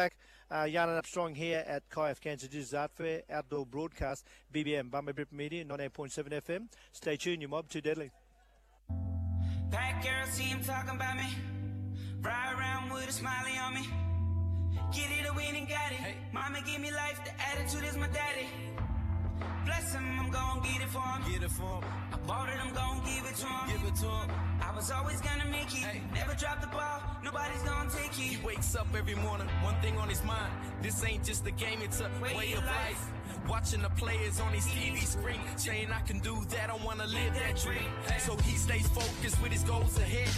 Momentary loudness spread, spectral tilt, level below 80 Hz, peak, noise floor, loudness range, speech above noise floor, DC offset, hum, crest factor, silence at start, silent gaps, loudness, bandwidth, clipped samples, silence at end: 7 LU; -4 dB/octave; -42 dBFS; -20 dBFS; -64 dBFS; 5 LU; 30 dB; under 0.1%; none; 14 dB; 0 s; none; -35 LUFS; 14.5 kHz; under 0.1%; 0 s